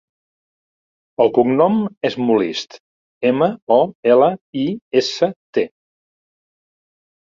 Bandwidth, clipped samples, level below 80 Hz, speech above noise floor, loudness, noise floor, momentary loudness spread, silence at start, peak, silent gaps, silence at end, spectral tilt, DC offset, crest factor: 7.6 kHz; under 0.1%; -64 dBFS; over 73 dB; -17 LUFS; under -90 dBFS; 9 LU; 1.2 s; -2 dBFS; 1.97-2.01 s, 2.80-3.21 s, 3.62-3.67 s, 3.95-4.03 s, 4.41-4.53 s, 4.82-4.91 s, 5.36-5.53 s; 1.65 s; -6 dB/octave; under 0.1%; 18 dB